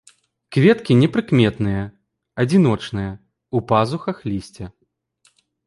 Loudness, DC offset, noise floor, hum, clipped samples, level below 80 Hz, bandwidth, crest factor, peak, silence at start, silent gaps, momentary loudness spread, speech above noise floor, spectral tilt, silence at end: -19 LUFS; under 0.1%; -63 dBFS; none; under 0.1%; -46 dBFS; 11.5 kHz; 18 dB; -2 dBFS; 0.5 s; none; 19 LU; 45 dB; -7.5 dB/octave; 0.95 s